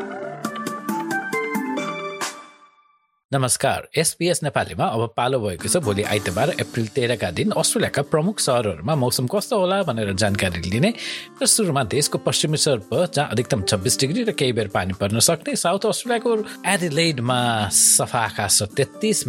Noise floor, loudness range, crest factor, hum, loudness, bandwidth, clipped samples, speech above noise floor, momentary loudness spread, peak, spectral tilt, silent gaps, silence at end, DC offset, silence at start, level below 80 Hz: -61 dBFS; 5 LU; 18 dB; none; -21 LUFS; 17 kHz; under 0.1%; 40 dB; 8 LU; -2 dBFS; -3.5 dB/octave; 3.25-3.29 s; 0 s; under 0.1%; 0 s; -56 dBFS